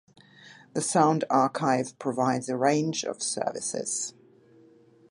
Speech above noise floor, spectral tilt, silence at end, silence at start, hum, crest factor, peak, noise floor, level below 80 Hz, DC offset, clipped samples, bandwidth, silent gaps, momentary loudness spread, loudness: 30 dB; -4 dB/octave; 1 s; 0.45 s; none; 22 dB; -6 dBFS; -57 dBFS; -76 dBFS; under 0.1%; under 0.1%; 11.5 kHz; none; 8 LU; -27 LUFS